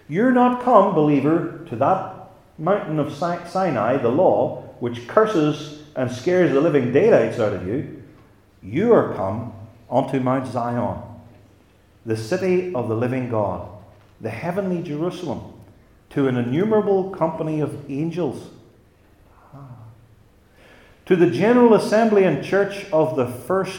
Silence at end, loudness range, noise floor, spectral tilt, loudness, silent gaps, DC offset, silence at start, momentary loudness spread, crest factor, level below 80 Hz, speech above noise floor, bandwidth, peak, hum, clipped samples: 0 s; 7 LU; -54 dBFS; -7.5 dB/octave; -20 LUFS; none; under 0.1%; 0.1 s; 14 LU; 20 dB; -58 dBFS; 34 dB; 16.5 kHz; 0 dBFS; none; under 0.1%